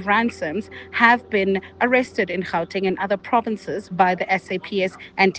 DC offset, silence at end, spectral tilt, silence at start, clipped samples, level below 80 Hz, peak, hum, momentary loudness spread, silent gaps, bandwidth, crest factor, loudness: under 0.1%; 0 s; -5.5 dB/octave; 0 s; under 0.1%; -62 dBFS; -2 dBFS; none; 11 LU; none; 9 kHz; 20 dB; -21 LUFS